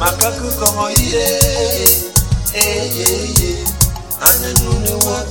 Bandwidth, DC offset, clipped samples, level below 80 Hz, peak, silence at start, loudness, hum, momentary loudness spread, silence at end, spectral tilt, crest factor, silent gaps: over 20 kHz; 0.3%; 0.2%; -24 dBFS; 0 dBFS; 0 s; -13 LUFS; none; 5 LU; 0 s; -3 dB/octave; 14 dB; none